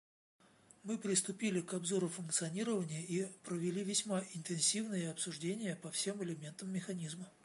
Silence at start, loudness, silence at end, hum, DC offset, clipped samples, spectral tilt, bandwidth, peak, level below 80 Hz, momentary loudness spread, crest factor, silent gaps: 0.85 s; -38 LUFS; 0.15 s; none; under 0.1%; under 0.1%; -3.5 dB/octave; 11.5 kHz; -20 dBFS; -84 dBFS; 9 LU; 20 dB; none